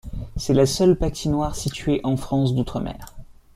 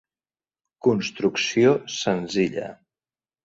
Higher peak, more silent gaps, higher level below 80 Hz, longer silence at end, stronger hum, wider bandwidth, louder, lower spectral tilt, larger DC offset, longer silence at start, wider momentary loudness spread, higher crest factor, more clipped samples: about the same, -6 dBFS vs -6 dBFS; neither; first, -36 dBFS vs -62 dBFS; second, 0.25 s vs 0.7 s; neither; first, 16 kHz vs 7.8 kHz; about the same, -22 LUFS vs -23 LUFS; about the same, -6 dB/octave vs -5 dB/octave; neither; second, 0.05 s vs 0.85 s; first, 12 LU vs 7 LU; about the same, 16 dB vs 20 dB; neither